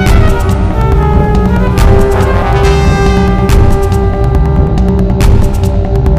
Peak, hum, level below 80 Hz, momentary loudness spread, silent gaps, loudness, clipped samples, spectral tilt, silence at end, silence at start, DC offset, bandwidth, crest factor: 0 dBFS; none; -10 dBFS; 3 LU; none; -10 LUFS; 2%; -7 dB/octave; 0 s; 0 s; 2%; 15.5 kHz; 8 dB